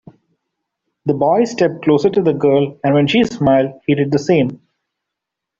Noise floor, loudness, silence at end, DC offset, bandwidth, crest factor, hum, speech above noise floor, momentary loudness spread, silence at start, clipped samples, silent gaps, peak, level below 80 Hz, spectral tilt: -81 dBFS; -15 LUFS; 1.05 s; under 0.1%; 7.6 kHz; 14 dB; none; 67 dB; 4 LU; 1.05 s; under 0.1%; none; -2 dBFS; -52 dBFS; -7 dB/octave